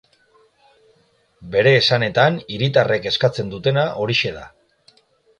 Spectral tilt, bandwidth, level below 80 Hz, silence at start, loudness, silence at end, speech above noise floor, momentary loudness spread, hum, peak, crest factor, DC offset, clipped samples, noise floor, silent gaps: -5.5 dB/octave; 9.8 kHz; -54 dBFS; 1.4 s; -18 LUFS; 0.9 s; 42 dB; 8 LU; none; -2 dBFS; 20 dB; under 0.1%; under 0.1%; -60 dBFS; none